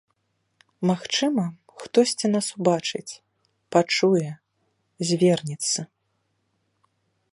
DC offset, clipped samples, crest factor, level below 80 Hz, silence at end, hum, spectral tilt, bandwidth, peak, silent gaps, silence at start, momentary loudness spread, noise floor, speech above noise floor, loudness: under 0.1%; under 0.1%; 22 dB; -70 dBFS; 1.5 s; none; -4.5 dB/octave; 11.5 kHz; -4 dBFS; none; 0.8 s; 16 LU; -73 dBFS; 51 dB; -23 LUFS